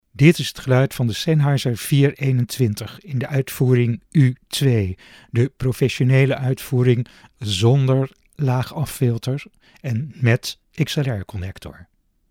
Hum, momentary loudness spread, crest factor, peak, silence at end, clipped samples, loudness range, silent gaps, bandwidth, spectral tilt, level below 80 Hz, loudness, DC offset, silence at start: none; 12 LU; 20 dB; 0 dBFS; 0.5 s; under 0.1%; 4 LU; none; 17 kHz; -6.5 dB/octave; -50 dBFS; -20 LUFS; under 0.1%; 0.15 s